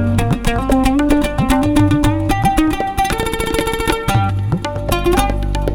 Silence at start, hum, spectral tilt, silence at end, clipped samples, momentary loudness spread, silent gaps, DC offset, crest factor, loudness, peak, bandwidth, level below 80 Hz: 0 s; none; -6 dB/octave; 0 s; under 0.1%; 5 LU; none; under 0.1%; 14 dB; -16 LUFS; 0 dBFS; 18 kHz; -22 dBFS